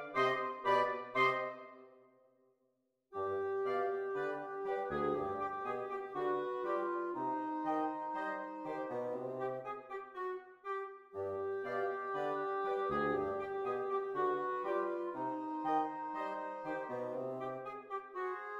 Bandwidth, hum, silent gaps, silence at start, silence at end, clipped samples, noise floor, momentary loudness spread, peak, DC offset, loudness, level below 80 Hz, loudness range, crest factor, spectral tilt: 7.8 kHz; none; none; 0 s; 0 s; under 0.1%; -80 dBFS; 10 LU; -20 dBFS; under 0.1%; -38 LUFS; -74 dBFS; 4 LU; 20 dB; -6.5 dB/octave